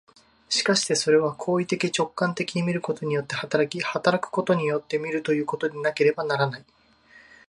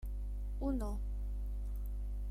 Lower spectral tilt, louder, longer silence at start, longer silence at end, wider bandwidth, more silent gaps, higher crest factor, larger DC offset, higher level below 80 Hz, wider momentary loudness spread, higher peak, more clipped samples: second, -4 dB/octave vs -9 dB/octave; first, -24 LUFS vs -42 LUFS; first, 0.5 s vs 0 s; first, 0.3 s vs 0 s; second, 11.5 kHz vs 13.5 kHz; neither; first, 20 dB vs 14 dB; neither; second, -68 dBFS vs -38 dBFS; about the same, 6 LU vs 5 LU; first, -4 dBFS vs -24 dBFS; neither